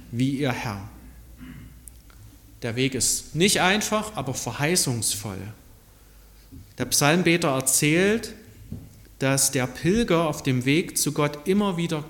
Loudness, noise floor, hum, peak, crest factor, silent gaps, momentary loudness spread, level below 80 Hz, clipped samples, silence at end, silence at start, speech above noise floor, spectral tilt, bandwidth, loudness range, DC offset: -23 LUFS; -51 dBFS; none; -4 dBFS; 20 dB; none; 21 LU; -48 dBFS; under 0.1%; 0 s; 0 s; 27 dB; -3.5 dB/octave; 17.5 kHz; 4 LU; under 0.1%